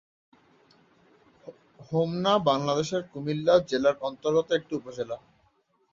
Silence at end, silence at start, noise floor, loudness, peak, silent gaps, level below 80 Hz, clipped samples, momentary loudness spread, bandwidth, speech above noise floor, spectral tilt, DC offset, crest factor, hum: 0.75 s; 1.45 s; -68 dBFS; -27 LUFS; -8 dBFS; none; -64 dBFS; under 0.1%; 12 LU; 7.6 kHz; 42 dB; -5.5 dB/octave; under 0.1%; 20 dB; none